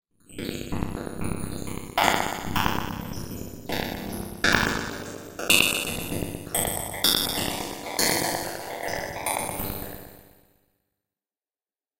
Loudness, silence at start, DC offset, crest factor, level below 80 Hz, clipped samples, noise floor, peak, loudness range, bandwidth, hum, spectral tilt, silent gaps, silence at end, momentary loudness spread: -26 LUFS; 0.3 s; under 0.1%; 28 dB; -46 dBFS; under 0.1%; under -90 dBFS; 0 dBFS; 6 LU; 17 kHz; none; -2.5 dB/octave; none; 1.75 s; 14 LU